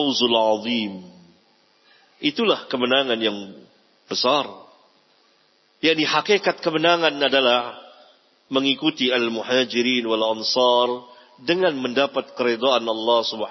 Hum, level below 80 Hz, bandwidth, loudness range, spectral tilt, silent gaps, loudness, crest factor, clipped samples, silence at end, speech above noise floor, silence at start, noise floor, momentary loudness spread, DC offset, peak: none; -76 dBFS; 6.2 kHz; 4 LU; -3.5 dB/octave; none; -20 LUFS; 20 dB; under 0.1%; 0 s; 40 dB; 0 s; -61 dBFS; 8 LU; under 0.1%; -2 dBFS